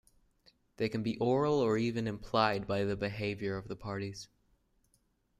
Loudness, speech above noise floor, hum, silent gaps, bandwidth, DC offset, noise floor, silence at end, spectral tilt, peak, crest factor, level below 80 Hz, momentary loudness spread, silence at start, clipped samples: -33 LUFS; 41 dB; none; none; 14 kHz; under 0.1%; -74 dBFS; 1.15 s; -6.5 dB/octave; -12 dBFS; 22 dB; -62 dBFS; 11 LU; 0.8 s; under 0.1%